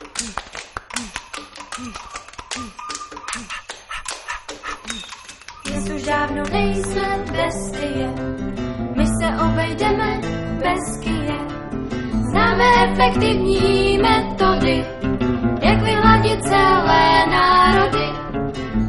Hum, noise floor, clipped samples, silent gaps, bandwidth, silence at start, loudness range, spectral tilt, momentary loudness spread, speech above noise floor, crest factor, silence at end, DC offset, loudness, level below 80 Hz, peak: none; -39 dBFS; under 0.1%; none; 11.5 kHz; 0 s; 15 LU; -5 dB/octave; 17 LU; 22 dB; 18 dB; 0 s; under 0.1%; -18 LUFS; -32 dBFS; 0 dBFS